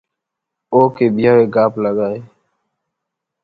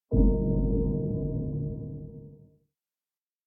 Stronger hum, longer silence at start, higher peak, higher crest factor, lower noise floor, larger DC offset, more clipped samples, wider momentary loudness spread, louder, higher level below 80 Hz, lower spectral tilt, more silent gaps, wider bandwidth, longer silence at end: neither; first, 0.7 s vs 0.1 s; first, 0 dBFS vs -10 dBFS; about the same, 16 dB vs 18 dB; second, -80 dBFS vs under -90 dBFS; neither; neither; second, 9 LU vs 17 LU; first, -14 LUFS vs -29 LUFS; second, -56 dBFS vs -32 dBFS; second, -10 dB/octave vs -16.5 dB/octave; neither; first, 5 kHz vs 1.1 kHz; about the same, 1.2 s vs 1.1 s